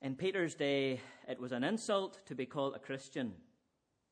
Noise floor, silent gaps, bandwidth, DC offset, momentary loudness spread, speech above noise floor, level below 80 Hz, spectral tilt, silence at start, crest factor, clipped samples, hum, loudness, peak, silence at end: -82 dBFS; none; 10 kHz; under 0.1%; 10 LU; 44 dB; -82 dBFS; -5 dB/octave; 0 s; 18 dB; under 0.1%; none; -38 LUFS; -20 dBFS; 0.75 s